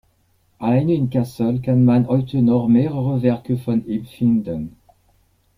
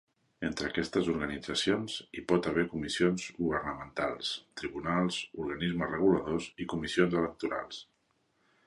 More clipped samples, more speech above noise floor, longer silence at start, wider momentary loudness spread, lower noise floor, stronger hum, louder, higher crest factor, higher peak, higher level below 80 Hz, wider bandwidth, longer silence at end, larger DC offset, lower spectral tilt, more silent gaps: neither; about the same, 43 dB vs 42 dB; first, 0.6 s vs 0.4 s; about the same, 10 LU vs 9 LU; second, -61 dBFS vs -74 dBFS; neither; first, -19 LUFS vs -32 LUFS; second, 14 dB vs 20 dB; first, -4 dBFS vs -12 dBFS; first, -52 dBFS vs -58 dBFS; about the same, 11.5 kHz vs 11.5 kHz; about the same, 0.9 s vs 0.85 s; neither; first, -10 dB/octave vs -5 dB/octave; neither